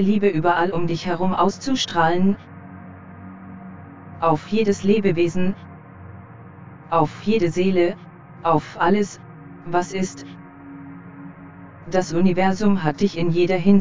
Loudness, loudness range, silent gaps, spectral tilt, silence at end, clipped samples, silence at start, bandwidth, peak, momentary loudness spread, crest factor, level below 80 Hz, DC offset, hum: -21 LUFS; 3 LU; none; -6.5 dB/octave; 0 s; under 0.1%; 0 s; 7.6 kHz; -4 dBFS; 22 LU; 18 dB; -52 dBFS; 1%; none